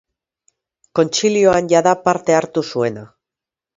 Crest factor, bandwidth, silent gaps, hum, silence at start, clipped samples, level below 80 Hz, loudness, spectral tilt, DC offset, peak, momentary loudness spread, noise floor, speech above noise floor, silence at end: 18 dB; 7.8 kHz; none; none; 0.95 s; under 0.1%; -54 dBFS; -16 LUFS; -4.5 dB/octave; under 0.1%; 0 dBFS; 9 LU; -87 dBFS; 72 dB; 0.7 s